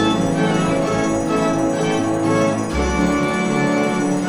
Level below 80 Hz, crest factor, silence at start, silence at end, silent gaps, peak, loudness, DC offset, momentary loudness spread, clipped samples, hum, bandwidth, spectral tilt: -36 dBFS; 12 dB; 0 s; 0 s; none; -6 dBFS; -18 LUFS; under 0.1%; 2 LU; under 0.1%; none; 17 kHz; -5.5 dB/octave